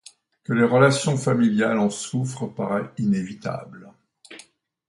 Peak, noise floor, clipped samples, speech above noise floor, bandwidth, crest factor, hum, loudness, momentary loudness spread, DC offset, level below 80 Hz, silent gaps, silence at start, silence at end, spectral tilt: -2 dBFS; -52 dBFS; under 0.1%; 31 dB; 11.5 kHz; 20 dB; none; -22 LUFS; 15 LU; under 0.1%; -64 dBFS; none; 0.5 s; 0.5 s; -6 dB/octave